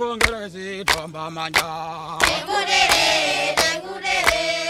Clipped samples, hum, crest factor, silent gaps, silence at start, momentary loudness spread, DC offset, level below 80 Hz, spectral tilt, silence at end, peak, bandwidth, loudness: under 0.1%; none; 20 dB; none; 0 s; 14 LU; under 0.1%; -44 dBFS; -1.5 dB/octave; 0 s; 0 dBFS; 16.5 kHz; -19 LUFS